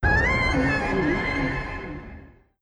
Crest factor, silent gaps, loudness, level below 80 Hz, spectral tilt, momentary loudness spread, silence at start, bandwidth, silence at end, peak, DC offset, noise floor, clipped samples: 16 dB; none; -23 LUFS; -32 dBFS; -6.5 dB/octave; 17 LU; 0 s; 10 kHz; 0.35 s; -8 dBFS; under 0.1%; -46 dBFS; under 0.1%